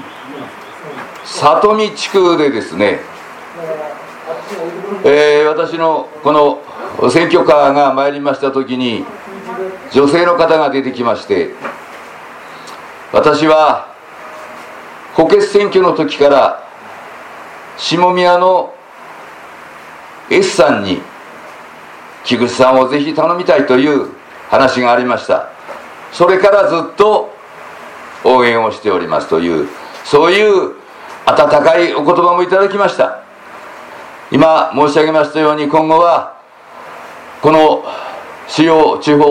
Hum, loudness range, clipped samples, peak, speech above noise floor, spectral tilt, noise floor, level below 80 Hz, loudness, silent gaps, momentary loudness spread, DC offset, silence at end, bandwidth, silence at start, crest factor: none; 4 LU; 0.1%; 0 dBFS; 26 dB; -5 dB/octave; -36 dBFS; -52 dBFS; -11 LUFS; none; 22 LU; under 0.1%; 0 s; 13 kHz; 0 s; 12 dB